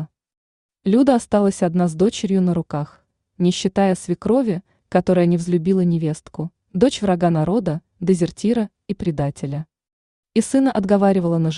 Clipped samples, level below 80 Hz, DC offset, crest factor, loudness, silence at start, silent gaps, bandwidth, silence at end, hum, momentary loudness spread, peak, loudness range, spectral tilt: under 0.1%; -50 dBFS; under 0.1%; 16 dB; -19 LUFS; 0 s; 0.37-0.69 s, 9.93-10.23 s; 11 kHz; 0 s; none; 11 LU; -2 dBFS; 2 LU; -7 dB/octave